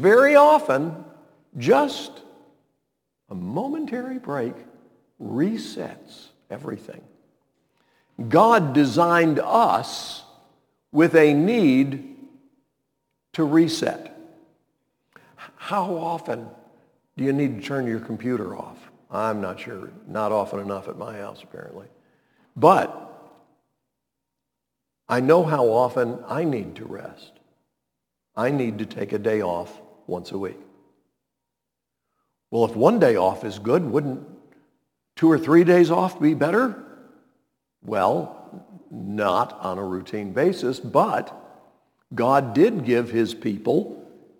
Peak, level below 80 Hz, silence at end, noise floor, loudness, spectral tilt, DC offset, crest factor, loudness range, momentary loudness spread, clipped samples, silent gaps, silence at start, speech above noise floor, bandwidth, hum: -2 dBFS; -70 dBFS; 0.35 s; -83 dBFS; -21 LUFS; -6.5 dB/octave; under 0.1%; 22 dB; 10 LU; 20 LU; under 0.1%; none; 0 s; 62 dB; 18.5 kHz; none